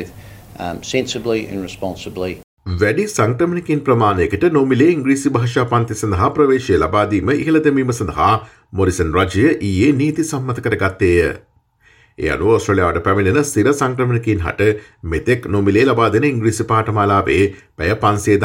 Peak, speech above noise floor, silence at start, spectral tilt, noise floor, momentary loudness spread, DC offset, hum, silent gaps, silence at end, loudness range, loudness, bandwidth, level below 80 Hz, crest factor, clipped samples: -2 dBFS; 37 dB; 0 s; -6 dB/octave; -53 dBFS; 11 LU; under 0.1%; none; 2.44-2.57 s; 0 s; 3 LU; -16 LUFS; 16.5 kHz; -42 dBFS; 14 dB; under 0.1%